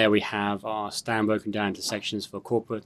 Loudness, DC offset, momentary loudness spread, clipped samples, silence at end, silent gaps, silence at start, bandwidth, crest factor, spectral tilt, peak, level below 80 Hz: -28 LUFS; under 0.1%; 6 LU; under 0.1%; 0.05 s; none; 0 s; 13.5 kHz; 20 dB; -4.5 dB/octave; -8 dBFS; -68 dBFS